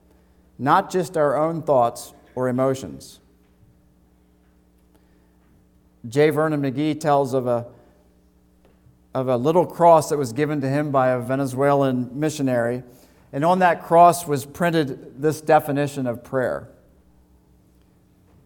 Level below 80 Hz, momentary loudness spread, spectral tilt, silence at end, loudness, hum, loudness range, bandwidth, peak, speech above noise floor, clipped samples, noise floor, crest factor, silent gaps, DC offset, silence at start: -58 dBFS; 12 LU; -6.5 dB/octave; 1.8 s; -21 LUFS; none; 7 LU; 19 kHz; -2 dBFS; 37 dB; under 0.1%; -57 dBFS; 20 dB; none; under 0.1%; 0.6 s